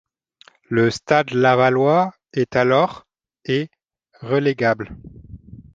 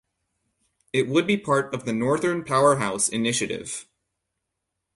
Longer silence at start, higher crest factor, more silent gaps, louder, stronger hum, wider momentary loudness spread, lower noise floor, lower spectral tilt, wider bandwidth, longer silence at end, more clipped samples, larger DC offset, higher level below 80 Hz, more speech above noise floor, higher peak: second, 0.7 s vs 0.95 s; about the same, 18 dB vs 18 dB; neither; first, -19 LUFS vs -23 LUFS; neither; about the same, 11 LU vs 9 LU; second, -54 dBFS vs -81 dBFS; first, -6.5 dB/octave vs -4 dB/octave; second, 9.2 kHz vs 11.5 kHz; second, 0.15 s vs 1.15 s; neither; neither; first, -52 dBFS vs -62 dBFS; second, 36 dB vs 58 dB; first, -2 dBFS vs -6 dBFS